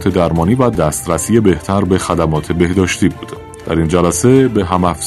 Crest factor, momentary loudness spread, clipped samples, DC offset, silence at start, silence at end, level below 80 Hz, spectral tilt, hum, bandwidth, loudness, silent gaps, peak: 14 dB; 6 LU; 0.2%; 0.1%; 0 s; 0 s; -36 dBFS; -6 dB/octave; none; 14 kHz; -13 LUFS; none; 0 dBFS